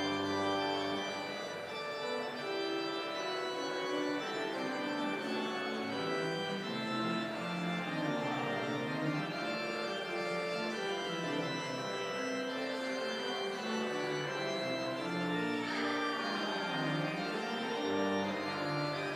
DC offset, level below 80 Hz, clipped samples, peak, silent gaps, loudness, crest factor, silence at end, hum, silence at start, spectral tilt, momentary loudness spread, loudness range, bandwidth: under 0.1%; -80 dBFS; under 0.1%; -22 dBFS; none; -36 LUFS; 16 dB; 0 s; none; 0 s; -4.5 dB/octave; 3 LU; 2 LU; 15.5 kHz